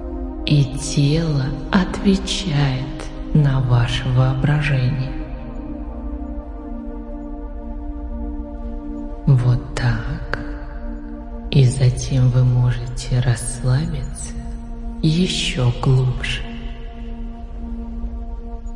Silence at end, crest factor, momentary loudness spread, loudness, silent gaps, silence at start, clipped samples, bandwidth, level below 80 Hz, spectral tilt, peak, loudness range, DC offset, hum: 0 s; 18 dB; 16 LU; -20 LUFS; none; 0 s; under 0.1%; 11 kHz; -28 dBFS; -6 dB/octave; 0 dBFS; 8 LU; under 0.1%; none